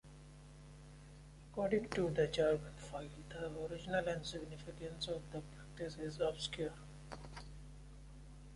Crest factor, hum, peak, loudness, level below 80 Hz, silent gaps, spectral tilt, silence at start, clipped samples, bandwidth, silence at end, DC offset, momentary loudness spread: 20 dB; none; -22 dBFS; -41 LUFS; -58 dBFS; none; -5.5 dB/octave; 0.05 s; under 0.1%; 11.5 kHz; 0 s; under 0.1%; 22 LU